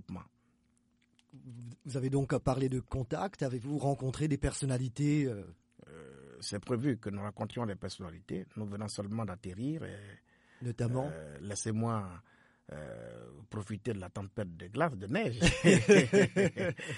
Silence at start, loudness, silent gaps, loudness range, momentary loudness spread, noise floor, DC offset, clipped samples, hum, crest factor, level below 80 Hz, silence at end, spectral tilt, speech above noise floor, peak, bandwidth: 0.1 s; -33 LUFS; none; 10 LU; 20 LU; -72 dBFS; under 0.1%; under 0.1%; none; 24 dB; -52 dBFS; 0 s; -5.5 dB/octave; 40 dB; -10 dBFS; 11.5 kHz